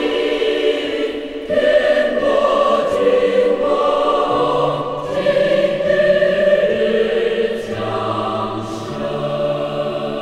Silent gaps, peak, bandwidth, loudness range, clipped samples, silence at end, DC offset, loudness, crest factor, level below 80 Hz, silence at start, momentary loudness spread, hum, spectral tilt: none; -4 dBFS; 11 kHz; 3 LU; under 0.1%; 0 s; under 0.1%; -17 LUFS; 14 dB; -46 dBFS; 0 s; 8 LU; none; -5.5 dB/octave